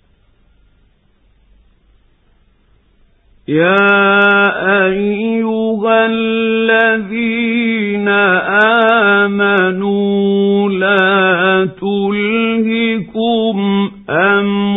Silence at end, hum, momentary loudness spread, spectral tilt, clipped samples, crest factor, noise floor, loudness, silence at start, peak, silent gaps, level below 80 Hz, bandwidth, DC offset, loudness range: 0 s; none; 7 LU; -8.5 dB/octave; under 0.1%; 14 dB; -53 dBFS; -12 LUFS; 3.5 s; 0 dBFS; none; -52 dBFS; 4 kHz; under 0.1%; 3 LU